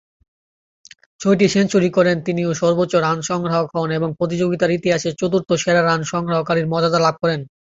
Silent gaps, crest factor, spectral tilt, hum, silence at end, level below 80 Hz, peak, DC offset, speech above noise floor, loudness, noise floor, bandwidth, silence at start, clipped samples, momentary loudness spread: none; 16 dB; -5.5 dB/octave; none; 0.3 s; -54 dBFS; -2 dBFS; under 0.1%; over 72 dB; -18 LUFS; under -90 dBFS; 8 kHz; 1.2 s; under 0.1%; 6 LU